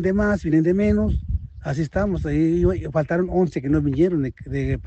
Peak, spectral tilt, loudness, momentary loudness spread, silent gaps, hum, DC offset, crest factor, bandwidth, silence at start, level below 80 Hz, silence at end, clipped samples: -6 dBFS; -9 dB/octave; -22 LUFS; 8 LU; none; none; under 0.1%; 14 dB; 8.2 kHz; 0 s; -32 dBFS; 0 s; under 0.1%